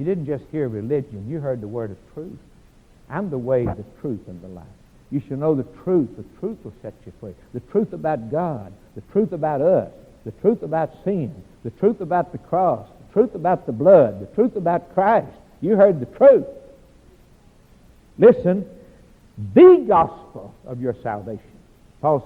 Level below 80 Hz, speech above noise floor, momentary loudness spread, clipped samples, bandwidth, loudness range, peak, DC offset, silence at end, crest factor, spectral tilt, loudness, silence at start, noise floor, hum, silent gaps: -52 dBFS; 32 dB; 23 LU; under 0.1%; 4.3 kHz; 11 LU; 0 dBFS; under 0.1%; 0 s; 20 dB; -10 dB/octave; -20 LUFS; 0 s; -51 dBFS; none; none